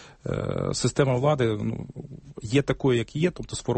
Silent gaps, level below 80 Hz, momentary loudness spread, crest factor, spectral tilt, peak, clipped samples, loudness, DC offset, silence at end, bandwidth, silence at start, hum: none; -48 dBFS; 16 LU; 18 dB; -6 dB/octave; -8 dBFS; under 0.1%; -25 LUFS; under 0.1%; 0 s; 8.8 kHz; 0 s; none